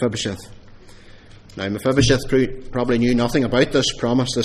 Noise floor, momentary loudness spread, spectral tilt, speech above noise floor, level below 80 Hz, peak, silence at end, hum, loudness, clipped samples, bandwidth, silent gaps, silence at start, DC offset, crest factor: -43 dBFS; 11 LU; -5 dB/octave; 24 dB; -36 dBFS; -2 dBFS; 0 s; none; -19 LUFS; under 0.1%; 15 kHz; none; 0 s; under 0.1%; 18 dB